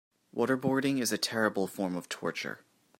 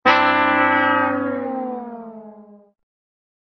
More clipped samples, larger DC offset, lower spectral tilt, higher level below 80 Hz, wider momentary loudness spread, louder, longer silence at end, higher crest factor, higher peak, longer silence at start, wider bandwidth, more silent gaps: neither; neither; first, -4 dB/octave vs -1.5 dB/octave; second, -76 dBFS vs -66 dBFS; second, 11 LU vs 19 LU; second, -31 LUFS vs -18 LUFS; second, 0.45 s vs 1.05 s; about the same, 20 dB vs 20 dB; second, -12 dBFS vs 0 dBFS; first, 0.35 s vs 0.05 s; first, 16 kHz vs 6.6 kHz; neither